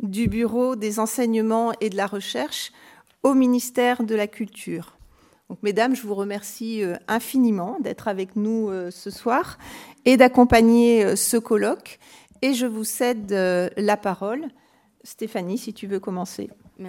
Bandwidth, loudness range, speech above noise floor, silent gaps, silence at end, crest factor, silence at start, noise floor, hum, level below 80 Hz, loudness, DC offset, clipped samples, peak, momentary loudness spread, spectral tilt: 17 kHz; 7 LU; 32 dB; none; 0 s; 22 dB; 0 s; -54 dBFS; none; -50 dBFS; -22 LUFS; under 0.1%; under 0.1%; 0 dBFS; 16 LU; -4.5 dB/octave